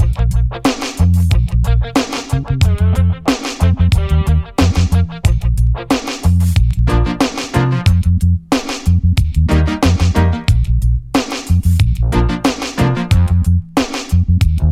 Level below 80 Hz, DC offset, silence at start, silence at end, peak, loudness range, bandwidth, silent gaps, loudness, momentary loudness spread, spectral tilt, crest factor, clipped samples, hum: -18 dBFS; under 0.1%; 0 s; 0 s; 0 dBFS; 1 LU; 14 kHz; none; -15 LUFS; 4 LU; -6.5 dB/octave; 12 dB; under 0.1%; none